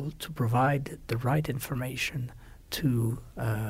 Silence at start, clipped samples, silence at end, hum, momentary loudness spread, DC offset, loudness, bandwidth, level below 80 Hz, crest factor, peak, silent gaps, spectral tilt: 0 s; under 0.1%; 0 s; none; 11 LU; under 0.1%; -30 LUFS; 16 kHz; -50 dBFS; 18 dB; -12 dBFS; none; -6 dB/octave